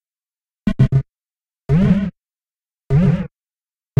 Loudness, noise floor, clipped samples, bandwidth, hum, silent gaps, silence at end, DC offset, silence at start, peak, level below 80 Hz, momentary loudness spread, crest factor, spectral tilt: -18 LUFS; under -90 dBFS; under 0.1%; 5.6 kHz; none; none; 0.75 s; under 0.1%; 0.65 s; -2 dBFS; -34 dBFS; 12 LU; 18 dB; -10 dB/octave